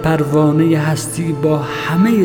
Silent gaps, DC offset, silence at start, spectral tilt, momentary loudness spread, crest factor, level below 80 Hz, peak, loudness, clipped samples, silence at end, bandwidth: none; under 0.1%; 0 s; -6.5 dB/octave; 6 LU; 12 dB; -42 dBFS; -2 dBFS; -15 LUFS; under 0.1%; 0 s; 18 kHz